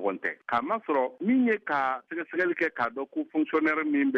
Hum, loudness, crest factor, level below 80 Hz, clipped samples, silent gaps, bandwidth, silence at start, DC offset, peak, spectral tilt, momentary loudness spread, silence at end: none; -28 LUFS; 14 dB; -74 dBFS; under 0.1%; none; 6.4 kHz; 0 s; under 0.1%; -14 dBFS; -7 dB/octave; 7 LU; 0 s